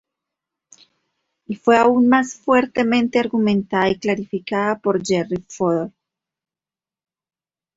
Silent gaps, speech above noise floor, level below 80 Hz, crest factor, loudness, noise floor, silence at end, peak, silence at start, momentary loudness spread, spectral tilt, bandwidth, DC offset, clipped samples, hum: none; over 72 dB; -58 dBFS; 18 dB; -19 LUFS; under -90 dBFS; 1.9 s; -2 dBFS; 1.5 s; 10 LU; -5.5 dB/octave; 8 kHz; under 0.1%; under 0.1%; none